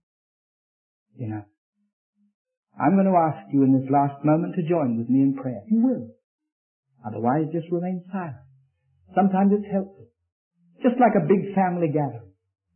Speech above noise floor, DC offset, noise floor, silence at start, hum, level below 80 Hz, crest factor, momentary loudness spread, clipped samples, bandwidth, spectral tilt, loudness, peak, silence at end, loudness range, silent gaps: 42 dB; under 0.1%; -63 dBFS; 1.2 s; none; -72 dBFS; 18 dB; 14 LU; under 0.1%; 3.3 kHz; -13 dB/octave; -23 LUFS; -6 dBFS; 0.55 s; 6 LU; 1.58-1.73 s, 1.93-2.13 s, 2.34-2.45 s, 2.57-2.63 s, 6.24-6.39 s, 6.52-6.83 s, 10.32-10.51 s